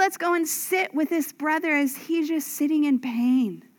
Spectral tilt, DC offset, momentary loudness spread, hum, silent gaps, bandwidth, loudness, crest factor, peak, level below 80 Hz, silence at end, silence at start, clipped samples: -3 dB/octave; under 0.1%; 4 LU; none; none; 19.5 kHz; -24 LUFS; 16 dB; -8 dBFS; under -90 dBFS; 0.2 s; 0 s; under 0.1%